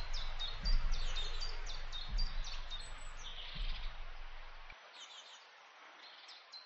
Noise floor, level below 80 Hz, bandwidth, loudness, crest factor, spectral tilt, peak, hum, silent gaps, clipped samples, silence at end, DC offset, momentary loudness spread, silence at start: -59 dBFS; -40 dBFS; 8.2 kHz; -45 LUFS; 18 dB; -2.5 dB/octave; -22 dBFS; none; none; under 0.1%; 0 s; under 0.1%; 14 LU; 0 s